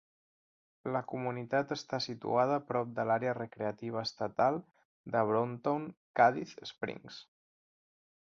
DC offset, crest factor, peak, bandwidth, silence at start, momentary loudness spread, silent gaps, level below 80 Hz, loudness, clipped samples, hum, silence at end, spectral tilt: under 0.1%; 22 dB; -12 dBFS; 7.4 kHz; 0.85 s; 12 LU; 4.85-5.04 s, 5.97-6.14 s; -76 dBFS; -34 LUFS; under 0.1%; none; 1.1 s; -6 dB/octave